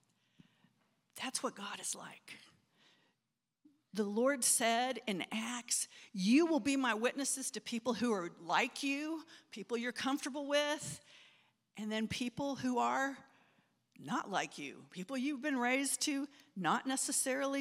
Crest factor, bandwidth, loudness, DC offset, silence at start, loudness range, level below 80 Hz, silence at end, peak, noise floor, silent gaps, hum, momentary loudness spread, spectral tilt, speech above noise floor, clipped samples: 22 dB; 16.5 kHz; -36 LUFS; under 0.1%; 1.15 s; 7 LU; -80 dBFS; 0 s; -16 dBFS; -88 dBFS; none; none; 15 LU; -2.5 dB/octave; 51 dB; under 0.1%